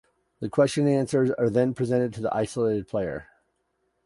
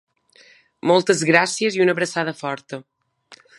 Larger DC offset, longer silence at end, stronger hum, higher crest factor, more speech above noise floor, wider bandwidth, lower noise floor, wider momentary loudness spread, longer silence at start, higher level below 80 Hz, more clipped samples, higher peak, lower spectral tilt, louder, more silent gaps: neither; first, 0.8 s vs 0.25 s; neither; about the same, 18 dB vs 22 dB; first, 50 dB vs 34 dB; about the same, 11.5 kHz vs 11.5 kHz; first, -74 dBFS vs -53 dBFS; second, 8 LU vs 15 LU; second, 0.4 s vs 0.85 s; first, -58 dBFS vs -72 dBFS; neither; second, -8 dBFS vs 0 dBFS; first, -7 dB/octave vs -4 dB/octave; second, -25 LUFS vs -19 LUFS; neither